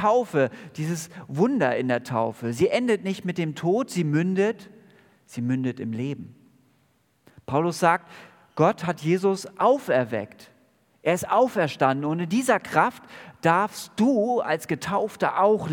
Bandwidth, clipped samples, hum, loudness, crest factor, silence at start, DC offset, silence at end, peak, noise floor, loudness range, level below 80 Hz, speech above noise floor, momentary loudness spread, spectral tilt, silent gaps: 18 kHz; under 0.1%; none; -24 LUFS; 22 dB; 0 s; under 0.1%; 0 s; -4 dBFS; -66 dBFS; 5 LU; -68 dBFS; 42 dB; 9 LU; -6 dB/octave; none